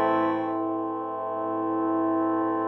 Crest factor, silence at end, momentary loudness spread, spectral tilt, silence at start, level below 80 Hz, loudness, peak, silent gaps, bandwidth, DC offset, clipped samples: 16 dB; 0 s; 6 LU; -9 dB/octave; 0 s; -74 dBFS; -27 LUFS; -12 dBFS; none; 4.2 kHz; under 0.1%; under 0.1%